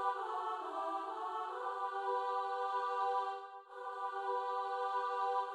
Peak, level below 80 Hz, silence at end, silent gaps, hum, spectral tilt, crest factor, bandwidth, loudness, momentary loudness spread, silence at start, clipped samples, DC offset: -24 dBFS; under -90 dBFS; 0 s; none; none; -1.5 dB/octave; 16 dB; 11.5 kHz; -39 LUFS; 6 LU; 0 s; under 0.1%; under 0.1%